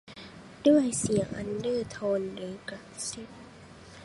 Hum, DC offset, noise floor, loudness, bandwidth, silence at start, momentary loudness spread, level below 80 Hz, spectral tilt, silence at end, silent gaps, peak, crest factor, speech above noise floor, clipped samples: none; under 0.1%; -50 dBFS; -29 LUFS; 11.5 kHz; 0.05 s; 24 LU; -58 dBFS; -5 dB/octave; 0 s; none; -10 dBFS; 20 dB; 21 dB; under 0.1%